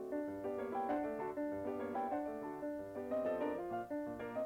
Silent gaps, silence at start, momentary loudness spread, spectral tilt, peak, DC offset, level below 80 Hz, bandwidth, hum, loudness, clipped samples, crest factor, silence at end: none; 0 s; 5 LU; -7.5 dB/octave; -30 dBFS; under 0.1%; -70 dBFS; 16.5 kHz; none; -41 LUFS; under 0.1%; 12 dB; 0 s